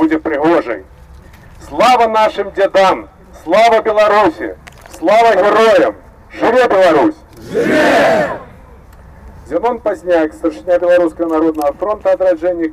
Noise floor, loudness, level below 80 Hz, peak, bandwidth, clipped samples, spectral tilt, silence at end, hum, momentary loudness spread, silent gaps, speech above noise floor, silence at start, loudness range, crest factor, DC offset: -38 dBFS; -12 LUFS; -42 dBFS; -4 dBFS; 15.5 kHz; under 0.1%; -5 dB/octave; 0 s; none; 11 LU; none; 26 dB; 0 s; 4 LU; 8 dB; under 0.1%